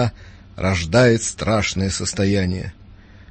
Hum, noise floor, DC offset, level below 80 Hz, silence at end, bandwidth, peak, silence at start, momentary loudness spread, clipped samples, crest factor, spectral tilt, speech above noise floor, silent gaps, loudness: none; -43 dBFS; under 0.1%; -40 dBFS; 0.1 s; 8.8 kHz; -2 dBFS; 0 s; 10 LU; under 0.1%; 18 dB; -5 dB/octave; 24 dB; none; -19 LUFS